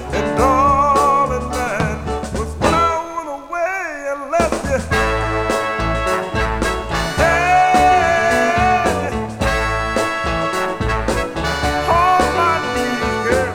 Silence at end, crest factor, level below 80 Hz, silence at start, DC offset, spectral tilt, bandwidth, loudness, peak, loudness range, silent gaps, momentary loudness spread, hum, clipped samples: 0 s; 16 dB; -30 dBFS; 0 s; under 0.1%; -4.5 dB/octave; 18 kHz; -17 LUFS; 0 dBFS; 4 LU; none; 8 LU; none; under 0.1%